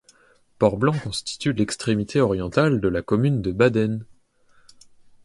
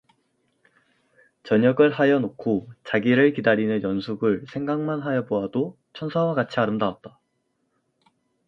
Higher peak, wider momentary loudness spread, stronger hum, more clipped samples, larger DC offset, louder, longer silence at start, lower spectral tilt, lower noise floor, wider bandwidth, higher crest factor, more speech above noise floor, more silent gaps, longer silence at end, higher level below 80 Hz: about the same, -4 dBFS vs -6 dBFS; second, 6 LU vs 10 LU; neither; neither; neither; about the same, -22 LUFS vs -23 LUFS; second, 0.6 s vs 1.45 s; second, -6.5 dB/octave vs -8.5 dB/octave; second, -58 dBFS vs -73 dBFS; first, 11.5 kHz vs 7.2 kHz; about the same, 20 dB vs 18 dB; second, 37 dB vs 51 dB; neither; second, 1.2 s vs 1.4 s; first, -48 dBFS vs -64 dBFS